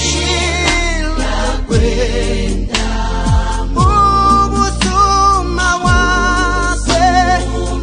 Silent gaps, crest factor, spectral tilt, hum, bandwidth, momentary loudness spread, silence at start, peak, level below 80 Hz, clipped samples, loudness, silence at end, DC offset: none; 12 dB; -4 dB/octave; none; 10 kHz; 7 LU; 0 s; 0 dBFS; -18 dBFS; under 0.1%; -13 LUFS; 0 s; under 0.1%